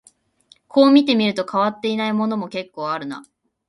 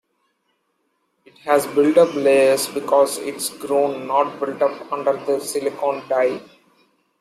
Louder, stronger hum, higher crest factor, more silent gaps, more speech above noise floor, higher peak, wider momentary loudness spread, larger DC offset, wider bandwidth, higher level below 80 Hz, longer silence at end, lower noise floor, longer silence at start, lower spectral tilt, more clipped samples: about the same, -19 LUFS vs -19 LUFS; neither; about the same, 18 dB vs 18 dB; neither; second, 37 dB vs 51 dB; about the same, -2 dBFS vs -2 dBFS; first, 15 LU vs 9 LU; neither; second, 11.5 kHz vs 15 kHz; about the same, -68 dBFS vs -68 dBFS; second, 0.45 s vs 0.75 s; second, -56 dBFS vs -70 dBFS; second, 0.75 s vs 1.45 s; first, -6 dB/octave vs -3.5 dB/octave; neither